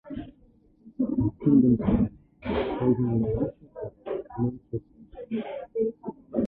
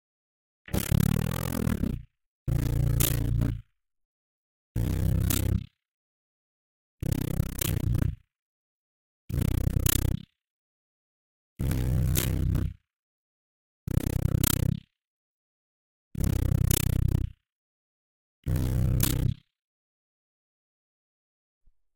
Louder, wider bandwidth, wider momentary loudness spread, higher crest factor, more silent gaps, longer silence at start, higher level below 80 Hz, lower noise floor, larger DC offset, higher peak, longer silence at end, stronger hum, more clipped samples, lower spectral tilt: about the same, -27 LUFS vs -28 LUFS; second, 4.3 kHz vs 17 kHz; first, 18 LU vs 12 LU; second, 18 dB vs 24 dB; second, none vs 2.26-2.46 s, 4.05-4.75 s, 5.91-6.98 s, 8.42-9.28 s, 10.50-11.56 s, 12.99-13.87 s, 15.07-16.11 s, 17.52-18.43 s; second, 0.05 s vs 0.7 s; second, -46 dBFS vs -36 dBFS; second, -59 dBFS vs under -90 dBFS; neither; second, -10 dBFS vs -6 dBFS; second, 0 s vs 2.65 s; neither; neither; first, -12 dB/octave vs -5.5 dB/octave